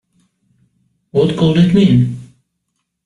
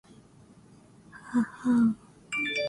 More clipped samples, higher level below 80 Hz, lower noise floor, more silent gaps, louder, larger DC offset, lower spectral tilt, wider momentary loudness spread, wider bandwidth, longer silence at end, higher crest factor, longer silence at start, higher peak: neither; first, -44 dBFS vs -66 dBFS; first, -72 dBFS vs -55 dBFS; neither; first, -13 LUFS vs -28 LUFS; neither; first, -8.5 dB/octave vs -5 dB/octave; second, 10 LU vs 14 LU; about the same, 10.5 kHz vs 11.5 kHz; first, 0.8 s vs 0 s; about the same, 14 dB vs 14 dB; about the same, 1.15 s vs 1.15 s; first, -2 dBFS vs -16 dBFS